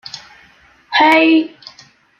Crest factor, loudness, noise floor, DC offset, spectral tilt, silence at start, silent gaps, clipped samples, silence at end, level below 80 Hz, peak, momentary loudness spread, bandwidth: 14 dB; -12 LUFS; -49 dBFS; under 0.1%; -3.5 dB/octave; 0.15 s; none; under 0.1%; 0.7 s; -64 dBFS; -2 dBFS; 22 LU; 7.6 kHz